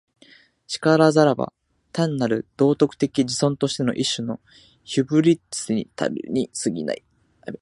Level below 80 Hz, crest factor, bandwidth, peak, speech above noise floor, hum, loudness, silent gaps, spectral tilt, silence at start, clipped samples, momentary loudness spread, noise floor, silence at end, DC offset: -62 dBFS; 20 dB; 11.5 kHz; -2 dBFS; 32 dB; none; -22 LUFS; none; -5.5 dB/octave; 0.7 s; under 0.1%; 14 LU; -53 dBFS; 0.05 s; under 0.1%